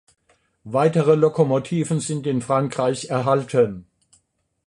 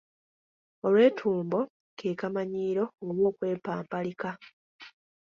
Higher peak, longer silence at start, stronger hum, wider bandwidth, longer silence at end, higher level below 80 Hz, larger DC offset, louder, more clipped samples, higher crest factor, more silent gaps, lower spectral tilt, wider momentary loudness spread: first, -4 dBFS vs -10 dBFS; second, 0.65 s vs 0.85 s; neither; first, 11 kHz vs 7 kHz; first, 0.85 s vs 0.45 s; first, -60 dBFS vs -72 dBFS; neither; first, -21 LUFS vs -29 LUFS; neither; about the same, 18 dB vs 20 dB; second, none vs 1.70-1.97 s, 4.53-4.79 s; second, -6.5 dB/octave vs -8 dB/octave; second, 7 LU vs 14 LU